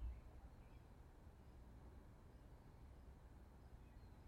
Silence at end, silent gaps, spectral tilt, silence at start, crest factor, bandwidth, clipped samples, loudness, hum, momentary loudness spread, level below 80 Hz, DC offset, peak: 0 s; none; -7 dB/octave; 0 s; 18 dB; 15.5 kHz; under 0.1%; -64 LUFS; none; 2 LU; -60 dBFS; under 0.1%; -42 dBFS